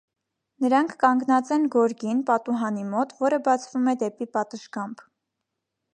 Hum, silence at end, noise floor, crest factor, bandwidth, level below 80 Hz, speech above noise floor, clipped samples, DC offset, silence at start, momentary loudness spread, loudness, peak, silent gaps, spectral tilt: none; 1 s; -82 dBFS; 20 dB; 10 kHz; -80 dBFS; 59 dB; under 0.1%; under 0.1%; 0.6 s; 10 LU; -24 LUFS; -4 dBFS; none; -5.5 dB/octave